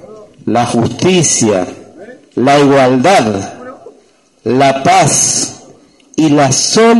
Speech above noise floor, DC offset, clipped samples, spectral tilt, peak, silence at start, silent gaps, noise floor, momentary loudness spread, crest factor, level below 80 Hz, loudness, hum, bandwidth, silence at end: 39 dB; under 0.1%; under 0.1%; -4 dB/octave; 0 dBFS; 0.1 s; none; -48 dBFS; 15 LU; 12 dB; -48 dBFS; -10 LUFS; none; 12 kHz; 0 s